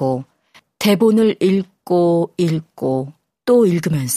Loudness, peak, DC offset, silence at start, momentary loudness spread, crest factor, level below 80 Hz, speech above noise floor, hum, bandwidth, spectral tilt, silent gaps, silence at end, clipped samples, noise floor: -17 LUFS; -2 dBFS; under 0.1%; 0 s; 9 LU; 16 dB; -58 dBFS; 37 dB; none; 15.5 kHz; -6 dB/octave; none; 0 s; under 0.1%; -53 dBFS